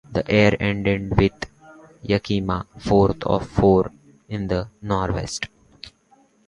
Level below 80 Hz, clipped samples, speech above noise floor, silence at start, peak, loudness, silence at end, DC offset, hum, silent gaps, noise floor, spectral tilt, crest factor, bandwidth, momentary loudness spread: -38 dBFS; under 0.1%; 38 dB; 0.1 s; 0 dBFS; -21 LUFS; 0.6 s; under 0.1%; none; none; -58 dBFS; -6.5 dB/octave; 22 dB; 11 kHz; 18 LU